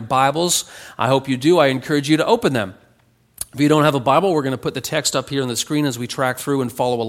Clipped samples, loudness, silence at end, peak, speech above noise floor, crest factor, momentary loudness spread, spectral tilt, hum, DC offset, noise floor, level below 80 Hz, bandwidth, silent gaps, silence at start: under 0.1%; -18 LUFS; 0 s; -2 dBFS; 39 dB; 18 dB; 8 LU; -4.5 dB/octave; none; under 0.1%; -57 dBFS; -56 dBFS; 16.5 kHz; none; 0 s